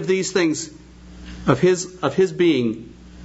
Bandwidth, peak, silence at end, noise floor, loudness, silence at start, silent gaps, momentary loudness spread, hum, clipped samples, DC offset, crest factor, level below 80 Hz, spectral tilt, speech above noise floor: 8 kHz; 0 dBFS; 0 s; -39 dBFS; -20 LUFS; 0 s; none; 14 LU; none; under 0.1%; under 0.1%; 20 dB; -46 dBFS; -5 dB/octave; 19 dB